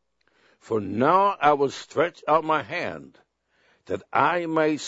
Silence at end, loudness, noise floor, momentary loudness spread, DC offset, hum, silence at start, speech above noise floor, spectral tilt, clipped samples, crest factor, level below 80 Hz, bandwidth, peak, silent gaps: 0 s; -23 LUFS; -66 dBFS; 13 LU; under 0.1%; none; 0.65 s; 42 dB; -5.5 dB/octave; under 0.1%; 20 dB; -66 dBFS; 8 kHz; -4 dBFS; none